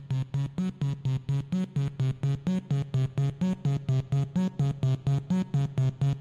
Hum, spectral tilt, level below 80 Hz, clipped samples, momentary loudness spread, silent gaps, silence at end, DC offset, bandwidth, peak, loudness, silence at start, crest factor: none; -8.5 dB/octave; -54 dBFS; under 0.1%; 3 LU; none; 0 s; under 0.1%; 7.4 kHz; -18 dBFS; -29 LUFS; 0 s; 10 dB